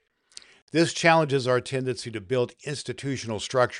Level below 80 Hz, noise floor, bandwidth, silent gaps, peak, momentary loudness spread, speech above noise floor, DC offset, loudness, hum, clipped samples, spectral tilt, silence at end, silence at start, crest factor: -64 dBFS; -51 dBFS; 11.5 kHz; none; -4 dBFS; 12 LU; 26 dB; under 0.1%; -25 LUFS; none; under 0.1%; -4.5 dB/octave; 0 s; 0.75 s; 22 dB